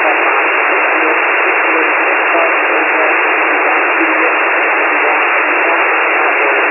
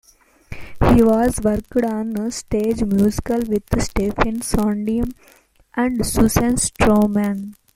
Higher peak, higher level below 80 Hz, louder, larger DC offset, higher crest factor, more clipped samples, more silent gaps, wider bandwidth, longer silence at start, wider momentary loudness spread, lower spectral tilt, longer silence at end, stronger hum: about the same, 0 dBFS vs 0 dBFS; second, under -90 dBFS vs -32 dBFS; first, -10 LUFS vs -19 LUFS; neither; second, 12 dB vs 18 dB; neither; neither; second, 3 kHz vs 16.5 kHz; second, 0 s vs 0.5 s; second, 0 LU vs 9 LU; second, -3 dB/octave vs -5.5 dB/octave; second, 0 s vs 0.25 s; neither